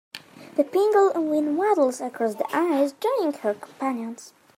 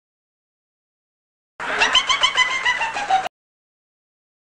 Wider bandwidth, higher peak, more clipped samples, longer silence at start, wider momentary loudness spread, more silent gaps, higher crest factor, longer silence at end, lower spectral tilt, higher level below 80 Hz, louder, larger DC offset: first, 16 kHz vs 10.5 kHz; second, -8 dBFS vs -4 dBFS; neither; second, 0.15 s vs 1.6 s; about the same, 12 LU vs 11 LU; neither; about the same, 16 dB vs 20 dB; second, 0.3 s vs 1.25 s; first, -4.5 dB/octave vs 1 dB/octave; second, -82 dBFS vs -54 dBFS; second, -24 LUFS vs -18 LUFS; neither